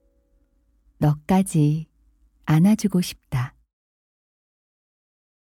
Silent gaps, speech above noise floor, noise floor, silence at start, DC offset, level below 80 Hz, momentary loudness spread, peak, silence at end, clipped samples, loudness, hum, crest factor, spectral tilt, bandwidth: none; 43 dB; -63 dBFS; 1 s; under 0.1%; -52 dBFS; 13 LU; -8 dBFS; 1.9 s; under 0.1%; -22 LUFS; none; 16 dB; -7 dB/octave; 16 kHz